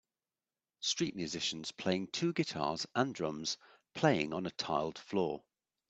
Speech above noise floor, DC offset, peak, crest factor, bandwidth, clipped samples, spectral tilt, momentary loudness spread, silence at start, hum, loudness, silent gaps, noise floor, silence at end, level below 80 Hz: over 55 dB; under 0.1%; -12 dBFS; 24 dB; 8.6 kHz; under 0.1%; -4 dB/octave; 6 LU; 0.8 s; none; -36 LUFS; none; under -90 dBFS; 0.5 s; -72 dBFS